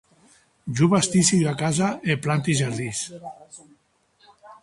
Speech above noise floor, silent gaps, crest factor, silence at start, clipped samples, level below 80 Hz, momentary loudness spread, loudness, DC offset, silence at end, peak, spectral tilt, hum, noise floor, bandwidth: 40 dB; none; 18 dB; 0.65 s; under 0.1%; -58 dBFS; 21 LU; -22 LUFS; under 0.1%; 0.1 s; -6 dBFS; -4.5 dB/octave; none; -62 dBFS; 11.5 kHz